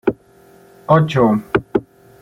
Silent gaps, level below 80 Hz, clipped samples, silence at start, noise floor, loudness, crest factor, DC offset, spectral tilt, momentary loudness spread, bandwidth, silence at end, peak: none; -46 dBFS; under 0.1%; 0.05 s; -48 dBFS; -17 LUFS; 16 dB; under 0.1%; -8 dB/octave; 17 LU; 11 kHz; 0.4 s; -2 dBFS